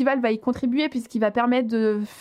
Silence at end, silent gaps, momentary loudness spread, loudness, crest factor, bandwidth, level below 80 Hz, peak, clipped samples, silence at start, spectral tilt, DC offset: 0 s; none; 3 LU; -23 LUFS; 16 dB; 12 kHz; -60 dBFS; -8 dBFS; under 0.1%; 0 s; -6 dB/octave; under 0.1%